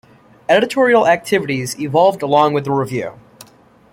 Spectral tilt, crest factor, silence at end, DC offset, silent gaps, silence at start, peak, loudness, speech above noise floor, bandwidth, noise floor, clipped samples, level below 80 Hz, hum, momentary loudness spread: -5 dB/octave; 14 dB; 0.8 s; under 0.1%; none; 0.5 s; -2 dBFS; -15 LUFS; 33 dB; 16.5 kHz; -48 dBFS; under 0.1%; -58 dBFS; none; 10 LU